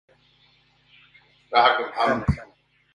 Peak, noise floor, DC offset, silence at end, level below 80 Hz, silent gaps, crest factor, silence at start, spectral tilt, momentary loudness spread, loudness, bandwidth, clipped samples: -4 dBFS; -61 dBFS; under 0.1%; 0.5 s; -42 dBFS; none; 22 dB; 1.5 s; -6.5 dB/octave; 9 LU; -22 LUFS; 11 kHz; under 0.1%